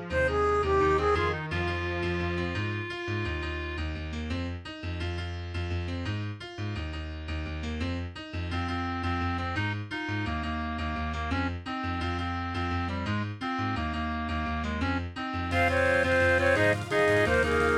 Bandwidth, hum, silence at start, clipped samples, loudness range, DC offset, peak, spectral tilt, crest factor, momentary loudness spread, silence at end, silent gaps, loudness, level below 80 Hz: 12 kHz; none; 0 s; under 0.1%; 8 LU; under 0.1%; -12 dBFS; -6 dB/octave; 18 dB; 11 LU; 0 s; none; -29 LUFS; -40 dBFS